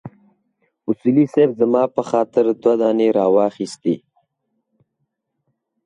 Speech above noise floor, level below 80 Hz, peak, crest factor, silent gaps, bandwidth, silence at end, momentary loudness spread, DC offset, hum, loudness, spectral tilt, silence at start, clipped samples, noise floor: 57 dB; -66 dBFS; -4 dBFS; 16 dB; none; 10.5 kHz; 1.9 s; 8 LU; under 0.1%; none; -18 LUFS; -7.5 dB/octave; 0.05 s; under 0.1%; -74 dBFS